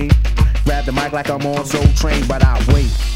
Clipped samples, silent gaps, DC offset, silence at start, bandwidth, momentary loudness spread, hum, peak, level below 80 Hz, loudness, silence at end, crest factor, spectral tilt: 0.3%; none; under 0.1%; 0 s; 15.5 kHz; 5 LU; none; 0 dBFS; -16 dBFS; -16 LUFS; 0 s; 14 dB; -6 dB/octave